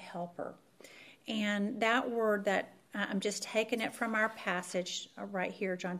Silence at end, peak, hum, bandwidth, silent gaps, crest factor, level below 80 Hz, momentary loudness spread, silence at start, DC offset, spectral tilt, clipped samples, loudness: 0 s; -14 dBFS; none; 15.5 kHz; none; 20 dB; -84 dBFS; 13 LU; 0 s; under 0.1%; -4 dB/octave; under 0.1%; -34 LUFS